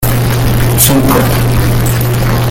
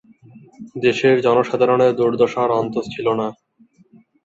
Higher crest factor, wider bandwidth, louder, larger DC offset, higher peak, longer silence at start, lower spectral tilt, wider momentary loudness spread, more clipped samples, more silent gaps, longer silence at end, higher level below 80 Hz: second, 10 dB vs 16 dB; first, 20 kHz vs 7.8 kHz; first, -10 LUFS vs -18 LUFS; neither; first, 0 dBFS vs -4 dBFS; second, 0 s vs 0.35 s; second, -5 dB/octave vs -6.5 dB/octave; second, 4 LU vs 9 LU; first, 0.2% vs under 0.1%; neither; second, 0 s vs 0.9 s; first, -18 dBFS vs -60 dBFS